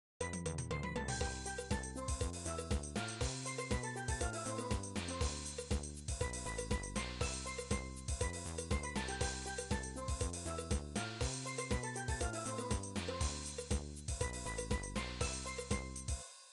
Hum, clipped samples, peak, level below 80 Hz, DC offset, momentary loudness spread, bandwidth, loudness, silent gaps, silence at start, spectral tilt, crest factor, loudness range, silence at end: none; under 0.1%; -22 dBFS; -46 dBFS; under 0.1%; 3 LU; 12 kHz; -41 LUFS; none; 0.2 s; -4 dB/octave; 18 dB; 1 LU; 0 s